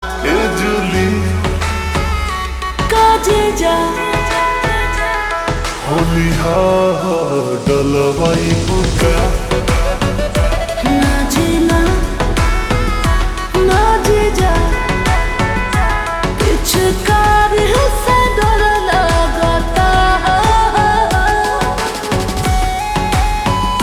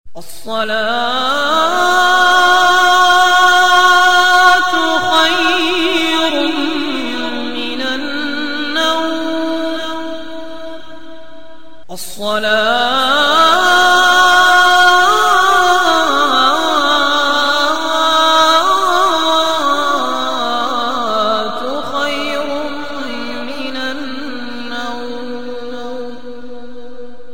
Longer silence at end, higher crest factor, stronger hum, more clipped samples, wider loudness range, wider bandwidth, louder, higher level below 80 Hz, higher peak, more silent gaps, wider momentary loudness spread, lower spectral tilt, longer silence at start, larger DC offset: about the same, 0 s vs 0 s; about the same, 12 dB vs 12 dB; neither; neither; second, 2 LU vs 14 LU; first, 20 kHz vs 17 kHz; about the same, -14 LUFS vs -12 LUFS; first, -20 dBFS vs -48 dBFS; about the same, 0 dBFS vs 0 dBFS; neither; second, 5 LU vs 17 LU; first, -5 dB/octave vs -1.5 dB/octave; about the same, 0 s vs 0.05 s; second, under 0.1% vs 5%